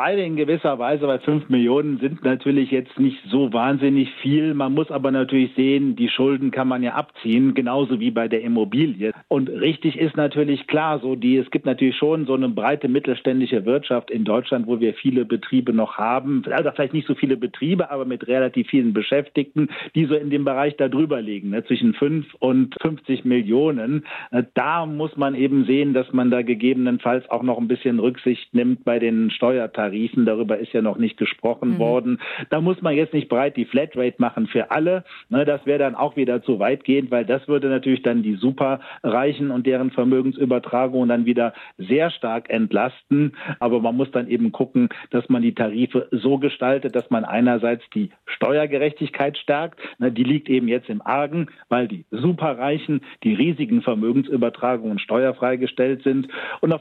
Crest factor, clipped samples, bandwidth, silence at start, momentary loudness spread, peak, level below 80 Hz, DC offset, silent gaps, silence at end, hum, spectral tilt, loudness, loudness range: 14 dB; under 0.1%; 4.3 kHz; 0 s; 5 LU; -6 dBFS; -70 dBFS; under 0.1%; none; 0 s; none; -9.5 dB/octave; -21 LUFS; 2 LU